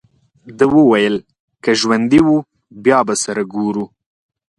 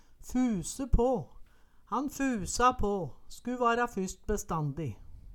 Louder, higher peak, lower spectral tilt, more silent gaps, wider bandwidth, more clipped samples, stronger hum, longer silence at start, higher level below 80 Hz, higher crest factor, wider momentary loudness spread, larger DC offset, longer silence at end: first, -15 LUFS vs -32 LUFS; first, 0 dBFS vs -12 dBFS; about the same, -4.5 dB/octave vs -5.5 dB/octave; first, 1.40-1.48 s vs none; second, 11.5 kHz vs 18.5 kHz; neither; neither; first, 0.45 s vs 0.1 s; second, -50 dBFS vs -40 dBFS; about the same, 16 dB vs 20 dB; about the same, 11 LU vs 13 LU; neither; first, 0.7 s vs 0 s